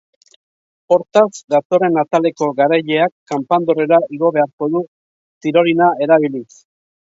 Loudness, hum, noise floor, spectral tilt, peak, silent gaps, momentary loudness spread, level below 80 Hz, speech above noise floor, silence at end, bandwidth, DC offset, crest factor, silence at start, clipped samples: -15 LUFS; none; under -90 dBFS; -6 dB/octave; 0 dBFS; 1.44-1.48 s, 1.65-1.70 s, 3.12-3.26 s, 4.53-4.58 s, 4.88-5.41 s; 8 LU; -66 dBFS; over 75 dB; 0.75 s; 7.8 kHz; under 0.1%; 16 dB; 0.9 s; under 0.1%